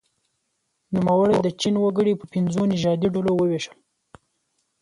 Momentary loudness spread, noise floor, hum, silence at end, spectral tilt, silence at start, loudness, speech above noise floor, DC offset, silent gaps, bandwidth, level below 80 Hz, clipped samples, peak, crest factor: 6 LU; -74 dBFS; none; 1.15 s; -6.5 dB/octave; 0.9 s; -22 LUFS; 53 dB; under 0.1%; none; 11 kHz; -58 dBFS; under 0.1%; -8 dBFS; 14 dB